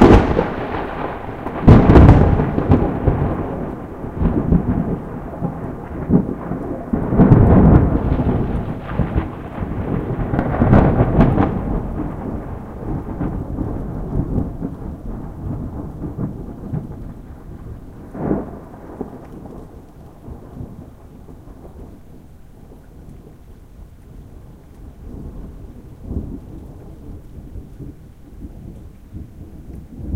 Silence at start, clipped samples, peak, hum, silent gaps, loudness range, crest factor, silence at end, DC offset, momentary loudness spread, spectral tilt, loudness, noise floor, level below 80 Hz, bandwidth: 0 s; under 0.1%; 0 dBFS; none; none; 23 LU; 18 dB; 0 s; under 0.1%; 25 LU; -10 dB/octave; -18 LUFS; -40 dBFS; -26 dBFS; 7.6 kHz